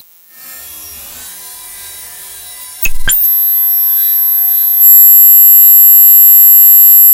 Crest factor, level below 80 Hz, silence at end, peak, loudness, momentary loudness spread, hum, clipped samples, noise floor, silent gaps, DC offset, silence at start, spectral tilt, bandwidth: 8 dB; -28 dBFS; 0 s; 0 dBFS; -2 LUFS; 8 LU; none; 0.2%; -36 dBFS; none; under 0.1%; 0.5 s; 1 dB/octave; 17.5 kHz